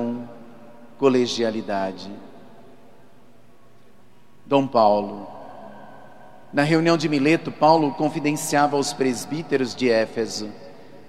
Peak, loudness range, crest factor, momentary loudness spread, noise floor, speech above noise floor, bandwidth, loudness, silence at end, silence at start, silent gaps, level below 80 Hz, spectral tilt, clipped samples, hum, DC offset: -4 dBFS; 6 LU; 20 dB; 21 LU; -55 dBFS; 34 dB; 15 kHz; -21 LUFS; 0.1 s; 0 s; none; -66 dBFS; -5 dB/octave; under 0.1%; none; 0.6%